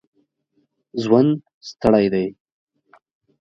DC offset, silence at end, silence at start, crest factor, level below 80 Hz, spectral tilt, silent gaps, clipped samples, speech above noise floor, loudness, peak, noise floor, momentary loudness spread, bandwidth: under 0.1%; 1.1 s; 0.95 s; 20 dB; -54 dBFS; -7.5 dB/octave; 1.54-1.61 s; under 0.1%; 50 dB; -19 LUFS; -2 dBFS; -68 dBFS; 14 LU; 7.6 kHz